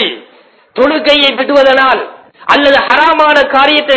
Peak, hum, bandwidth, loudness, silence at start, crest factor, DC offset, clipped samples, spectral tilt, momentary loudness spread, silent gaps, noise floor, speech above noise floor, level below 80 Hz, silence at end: 0 dBFS; none; 8 kHz; -8 LUFS; 0 s; 10 dB; under 0.1%; 1%; -3.5 dB/octave; 14 LU; none; -44 dBFS; 36 dB; -46 dBFS; 0 s